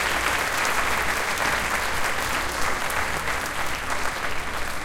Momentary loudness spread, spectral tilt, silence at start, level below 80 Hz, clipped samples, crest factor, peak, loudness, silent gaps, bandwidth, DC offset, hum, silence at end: 5 LU; -2 dB/octave; 0 s; -38 dBFS; under 0.1%; 16 dB; -8 dBFS; -24 LUFS; none; 17 kHz; under 0.1%; none; 0 s